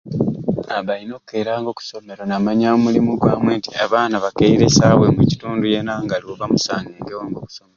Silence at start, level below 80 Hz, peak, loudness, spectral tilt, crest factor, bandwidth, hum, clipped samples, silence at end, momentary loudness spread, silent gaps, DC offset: 0.05 s; -44 dBFS; 0 dBFS; -17 LUFS; -5.5 dB/octave; 16 dB; 7.6 kHz; none; under 0.1%; 0.2 s; 16 LU; none; under 0.1%